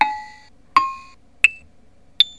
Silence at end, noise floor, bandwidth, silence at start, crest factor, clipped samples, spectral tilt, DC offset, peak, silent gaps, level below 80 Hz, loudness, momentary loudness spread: 0.1 s; -54 dBFS; 11 kHz; 0 s; 22 dB; under 0.1%; 0.5 dB/octave; 0.4%; 0 dBFS; none; -56 dBFS; -19 LUFS; 20 LU